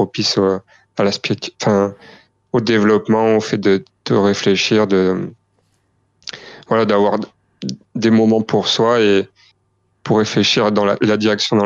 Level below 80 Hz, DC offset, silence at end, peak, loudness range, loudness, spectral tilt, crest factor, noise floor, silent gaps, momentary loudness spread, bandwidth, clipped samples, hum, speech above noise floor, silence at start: -60 dBFS; under 0.1%; 0 s; -2 dBFS; 3 LU; -16 LUFS; -5 dB/octave; 14 dB; -64 dBFS; none; 16 LU; 7.6 kHz; under 0.1%; none; 48 dB; 0 s